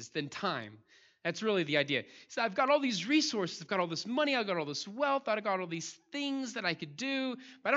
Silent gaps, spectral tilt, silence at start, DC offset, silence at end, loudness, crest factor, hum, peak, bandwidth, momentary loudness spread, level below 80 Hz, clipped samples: none; -4 dB/octave; 0 s; under 0.1%; 0 s; -33 LUFS; 20 dB; none; -12 dBFS; 8 kHz; 10 LU; -86 dBFS; under 0.1%